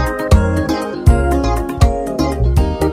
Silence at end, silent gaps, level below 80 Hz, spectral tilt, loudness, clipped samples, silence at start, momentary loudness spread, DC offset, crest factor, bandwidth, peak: 0 s; none; -18 dBFS; -7 dB/octave; -15 LUFS; 0.4%; 0 s; 5 LU; under 0.1%; 14 dB; 15 kHz; 0 dBFS